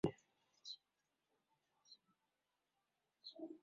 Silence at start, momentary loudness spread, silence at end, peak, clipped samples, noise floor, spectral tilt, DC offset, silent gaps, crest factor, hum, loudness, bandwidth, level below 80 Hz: 0.05 s; 15 LU; 0.05 s; -24 dBFS; under 0.1%; -89 dBFS; -5.5 dB/octave; under 0.1%; none; 30 dB; none; -53 LUFS; 7.2 kHz; -80 dBFS